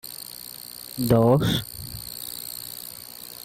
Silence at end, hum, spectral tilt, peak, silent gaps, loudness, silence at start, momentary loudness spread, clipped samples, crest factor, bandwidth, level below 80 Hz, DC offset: 0 s; none; -5.5 dB/octave; -8 dBFS; none; -25 LUFS; 0.05 s; 18 LU; under 0.1%; 20 dB; 16.5 kHz; -48 dBFS; under 0.1%